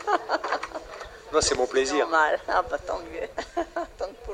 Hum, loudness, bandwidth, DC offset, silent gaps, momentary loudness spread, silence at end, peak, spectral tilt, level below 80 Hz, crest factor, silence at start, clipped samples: none; -26 LUFS; 12.5 kHz; under 0.1%; none; 13 LU; 0 s; -8 dBFS; -2.5 dB/octave; -48 dBFS; 20 dB; 0 s; under 0.1%